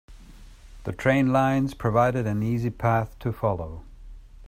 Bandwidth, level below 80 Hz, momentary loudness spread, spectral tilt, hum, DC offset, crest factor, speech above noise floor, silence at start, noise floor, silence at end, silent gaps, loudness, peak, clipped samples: 15.5 kHz; -44 dBFS; 15 LU; -8 dB/octave; none; under 0.1%; 18 dB; 22 dB; 0.1 s; -46 dBFS; 0 s; none; -24 LUFS; -6 dBFS; under 0.1%